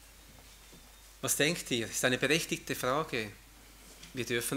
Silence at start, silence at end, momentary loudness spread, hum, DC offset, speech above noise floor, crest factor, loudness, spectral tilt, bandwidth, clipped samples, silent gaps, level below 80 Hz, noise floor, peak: 0 s; 0 s; 22 LU; none; under 0.1%; 23 dB; 24 dB; -31 LUFS; -3 dB/octave; 16 kHz; under 0.1%; none; -60 dBFS; -55 dBFS; -10 dBFS